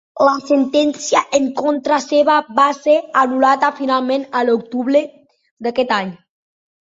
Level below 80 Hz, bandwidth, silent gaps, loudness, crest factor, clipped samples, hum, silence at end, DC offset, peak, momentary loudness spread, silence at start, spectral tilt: -64 dBFS; 8 kHz; 5.51-5.57 s; -16 LUFS; 16 dB; under 0.1%; none; 0.65 s; under 0.1%; -2 dBFS; 6 LU; 0.15 s; -3.5 dB/octave